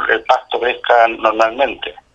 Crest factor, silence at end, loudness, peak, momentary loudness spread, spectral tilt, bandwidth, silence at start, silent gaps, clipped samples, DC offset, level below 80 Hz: 16 dB; 0.25 s; -15 LUFS; 0 dBFS; 6 LU; -3 dB/octave; 8 kHz; 0 s; none; under 0.1%; under 0.1%; -50 dBFS